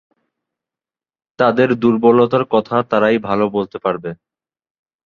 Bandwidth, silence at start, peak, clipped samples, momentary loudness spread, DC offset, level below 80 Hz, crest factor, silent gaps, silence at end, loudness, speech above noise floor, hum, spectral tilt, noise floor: 6.6 kHz; 1.4 s; -2 dBFS; under 0.1%; 9 LU; under 0.1%; -56 dBFS; 16 dB; none; 0.9 s; -16 LUFS; over 75 dB; none; -8.5 dB/octave; under -90 dBFS